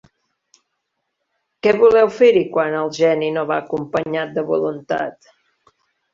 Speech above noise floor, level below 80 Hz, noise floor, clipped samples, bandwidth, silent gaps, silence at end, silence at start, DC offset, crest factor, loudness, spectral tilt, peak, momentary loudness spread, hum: 58 dB; -60 dBFS; -75 dBFS; under 0.1%; 7.4 kHz; none; 1 s; 1.65 s; under 0.1%; 18 dB; -17 LUFS; -6 dB/octave; -2 dBFS; 10 LU; none